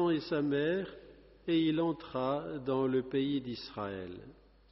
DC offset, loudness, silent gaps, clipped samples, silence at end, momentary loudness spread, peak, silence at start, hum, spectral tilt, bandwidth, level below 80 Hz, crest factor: under 0.1%; -34 LUFS; none; under 0.1%; 0.4 s; 14 LU; -20 dBFS; 0 s; none; -5 dB/octave; 5.8 kHz; -64 dBFS; 14 dB